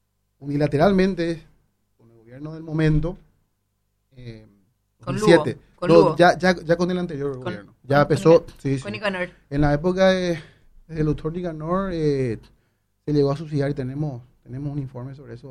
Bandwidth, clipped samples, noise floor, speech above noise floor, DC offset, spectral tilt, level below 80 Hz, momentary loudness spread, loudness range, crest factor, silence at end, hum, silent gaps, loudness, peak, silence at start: 12 kHz; under 0.1%; -71 dBFS; 50 dB; under 0.1%; -7 dB/octave; -40 dBFS; 20 LU; 8 LU; 22 dB; 0 s; none; none; -21 LUFS; -2 dBFS; 0.4 s